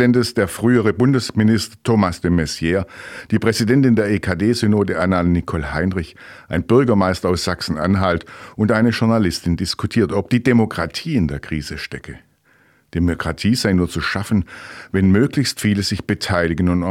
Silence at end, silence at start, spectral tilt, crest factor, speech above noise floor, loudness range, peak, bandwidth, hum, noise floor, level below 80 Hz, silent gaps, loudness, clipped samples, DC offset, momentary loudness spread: 0 s; 0 s; -6 dB/octave; 16 dB; 38 dB; 4 LU; -2 dBFS; 16 kHz; none; -56 dBFS; -40 dBFS; none; -18 LUFS; under 0.1%; under 0.1%; 10 LU